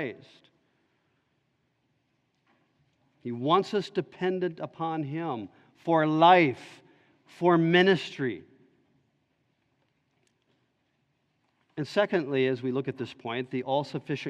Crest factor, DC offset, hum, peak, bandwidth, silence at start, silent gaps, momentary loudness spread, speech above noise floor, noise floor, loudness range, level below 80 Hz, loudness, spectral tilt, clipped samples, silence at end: 24 dB; under 0.1%; none; -6 dBFS; 9 kHz; 0 s; none; 17 LU; 47 dB; -74 dBFS; 11 LU; -78 dBFS; -27 LUFS; -7 dB/octave; under 0.1%; 0 s